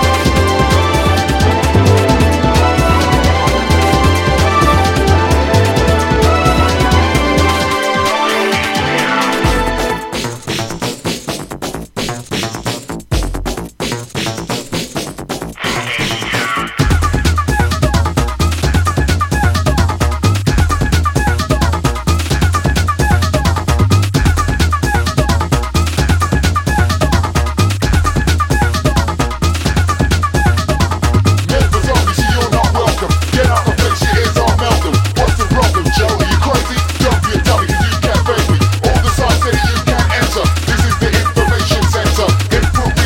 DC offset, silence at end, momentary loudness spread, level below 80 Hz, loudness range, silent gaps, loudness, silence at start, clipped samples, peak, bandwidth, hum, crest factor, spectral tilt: under 0.1%; 0 s; 8 LU; -20 dBFS; 7 LU; none; -13 LUFS; 0 s; under 0.1%; 0 dBFS; 17 kHz; none; 12 dB; -5 dB/octave